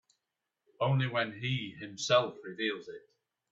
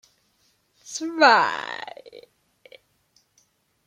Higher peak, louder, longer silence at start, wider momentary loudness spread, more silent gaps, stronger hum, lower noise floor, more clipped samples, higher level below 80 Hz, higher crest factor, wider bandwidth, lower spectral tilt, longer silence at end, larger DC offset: second, -14 dBFS vs -4 dBFS; second, -32 LUFS vs -20 LUFS; about the same, 0.8 s vs 0.85 s; second, 14 LU vs 22 LU; neither; neither; first, -87 dBFS vs -66 dBFS; neither; first, -72 dBFS vs -78 dBFS; about the same, 20 dB vs 24 dB; second, 8 kHz vs 15 kHz; first, -5 dB/octave vs -2 dB/octave; second, 0.5 s vs 1.65 s; neither